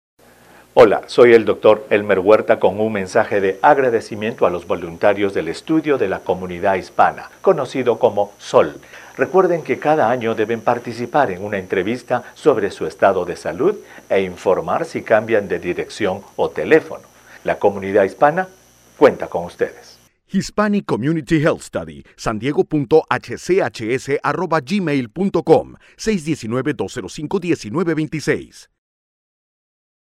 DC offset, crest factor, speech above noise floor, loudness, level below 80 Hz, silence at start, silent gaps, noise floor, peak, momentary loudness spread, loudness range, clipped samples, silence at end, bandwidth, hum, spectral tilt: under 0.1%; 18 dB; 30 dB; -18 LUFS; -50 dBFS; 0.75 s; none; -47 dBFS; 0 dBFS; 11 LU; 5 LU; under 0.1%; 1.55 s; 14 kHz; none; -6 dB/octave